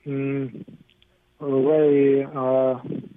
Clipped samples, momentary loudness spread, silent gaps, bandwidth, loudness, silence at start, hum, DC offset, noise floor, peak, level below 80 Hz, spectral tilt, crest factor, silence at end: under 0.1%; 16 LU; none; 3.8 kHz; -21 LUFS; 0.05 s; none; under 0.1%; -61 dBFS; -8 dBFS; -68 dBFS; -11 dB/octave; 14 dB; 0.1 s